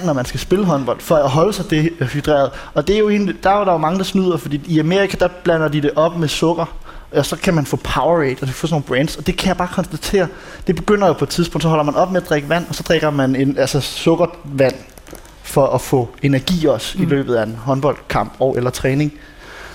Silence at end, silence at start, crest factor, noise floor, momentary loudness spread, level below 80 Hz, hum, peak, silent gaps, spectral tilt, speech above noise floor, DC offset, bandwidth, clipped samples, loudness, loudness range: 0 s; 0 s; 14 dB; -37 dBFS; 6 LU; -36 dBFS; none; -2 dBFS; none; -6 dB/octave; 21 dB; under 0.1%; 17 kHz; under 0.1%; -17 LUFS; 2 LU